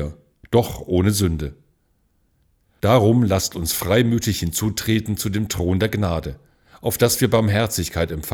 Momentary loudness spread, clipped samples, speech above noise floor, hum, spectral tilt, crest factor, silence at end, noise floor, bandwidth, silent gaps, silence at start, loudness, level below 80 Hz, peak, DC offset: 9 LU; under 0.1%; 45 dB; none; -5 dB/octave; 16 dB; 0 s; -64 dBFS; over 20 kHz; none; 0 s; -20 LUFS; -38 dBFS; -4 dBFS; under 0.1%